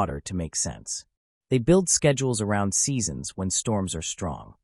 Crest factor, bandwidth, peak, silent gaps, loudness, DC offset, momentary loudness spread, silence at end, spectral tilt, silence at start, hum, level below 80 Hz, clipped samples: 18 dB; 13.5 kHz; -8 dBFS; 1.17-1.41 s; -25 LUFS; under 0.1%; 12 LU; 0.15 s; -4 dB/octave; 0 s; none; -48 dBFS; under 0.1%